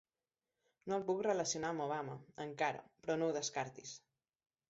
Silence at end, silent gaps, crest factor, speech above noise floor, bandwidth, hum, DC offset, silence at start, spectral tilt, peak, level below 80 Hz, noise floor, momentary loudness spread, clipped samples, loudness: 0.7 s; none; 18 dB; over 50 dB; 7.6 kHz; none; under 0.1%; 0.85 s; -3.5 dB/octave; -22 dBFS; -80 dBFS; under -90 dBFS; 14 LU; under 0.1%; -40 LUFS